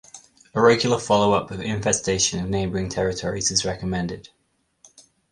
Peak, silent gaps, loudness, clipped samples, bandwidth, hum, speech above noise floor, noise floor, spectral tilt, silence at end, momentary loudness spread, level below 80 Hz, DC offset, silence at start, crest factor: -2 dBFS; none; -22 LUFS; under 0.1%; 11.5 kHz; none; 36 dB; -58 dBFS; -3.5 dB/octave; 1.1 s; 10 LU; -46 dBFS; under 0.1%; 0.15 s; 20 dB